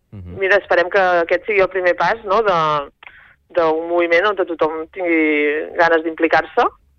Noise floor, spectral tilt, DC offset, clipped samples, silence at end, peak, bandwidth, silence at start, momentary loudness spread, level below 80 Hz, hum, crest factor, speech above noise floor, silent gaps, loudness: -44 dBFS; -5.5 dB/octave; under 0.1%; under 0.1%; 0.3 s; -2 dBFS; 6.8 kHz; 0.15 s; 6 LU; -52 dBFS; none; 14 dB; 27 dB; none; -17 LUFS